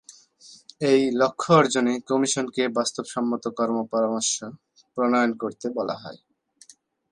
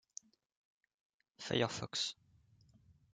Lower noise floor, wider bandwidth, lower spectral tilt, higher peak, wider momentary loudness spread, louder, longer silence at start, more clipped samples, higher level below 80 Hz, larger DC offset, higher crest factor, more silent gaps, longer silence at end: second, -54 dBFS vs -69 dBFS; first, 11.5 kHz vs 9.6 kHz; about the same, -4 dB/octave vs -3.5 dB/octave; first, -4 dBFS vs -20 dBFS; second, 11 LU vs 18 LU; first, -23 LUFS vs -38 LUFS; second, 0.1 s vs 1.4 s; neither; about the same, -70 dBFS vs -74 dBFS; neither; about the same, 20 dB vs 24 dB; neither; about the same, 0.95 s vs 1 s